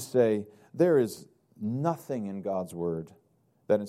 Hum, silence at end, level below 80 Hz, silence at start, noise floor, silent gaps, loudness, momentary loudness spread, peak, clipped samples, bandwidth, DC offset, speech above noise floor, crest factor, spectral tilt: none; 0 s; -70 dBFS; 0 s; -57 dBFS; none; -29 LUFS; 14 LU; -12 dBFS; under 0.1%; 15.5 kHz; under 0.1%; 29 dB; 18 dB; -7 dB/octave